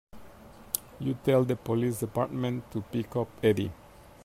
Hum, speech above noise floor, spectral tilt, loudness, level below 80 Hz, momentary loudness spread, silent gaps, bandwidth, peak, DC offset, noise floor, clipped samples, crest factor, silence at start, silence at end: none; 21 dB; -6 dB/octave; -30 LUFS; -58 dBFS; 9 LU; none; 16 kHz; -6 dBFS; under 0.1%; -50 dBFS; under 0.1%; 24 dB; 0.15 s; 0 s